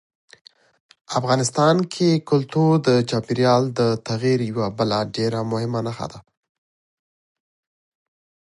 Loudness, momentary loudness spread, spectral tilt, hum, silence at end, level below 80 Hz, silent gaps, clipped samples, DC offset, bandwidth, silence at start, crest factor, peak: -20 LUFS; 8 LU; -6 dB/octave; none; 2.3 s; -60 dBFS; none; under 0.1%; under 0.1%; 11.5 kHz; 1.1 s; 18 dB; -4 dBFS